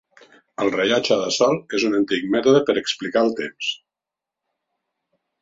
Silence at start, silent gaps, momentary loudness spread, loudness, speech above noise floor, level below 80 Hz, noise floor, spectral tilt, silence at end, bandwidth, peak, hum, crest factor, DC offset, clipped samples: 0.6 s; none; 9 LU; -20 LUFS; 67 dB; -64 dBFS; -87 dBFS; -4 dB/octave; 1.65 s; 7.8 kHz; -4 dBFS; none; 18 dB; under 0.1%; under 0.1%